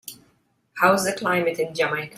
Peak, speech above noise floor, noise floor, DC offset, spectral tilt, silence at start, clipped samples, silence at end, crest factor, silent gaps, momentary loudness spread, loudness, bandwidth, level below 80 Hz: -4 dBFS; 43 dB; -65 dBFS; under 0.1%; -4 dB/octave; 0.05 s; under 0.1%; 0.1 s; 18 dB; none; 15 LU; -22 LUFS; 16 kHz; -66 dBFS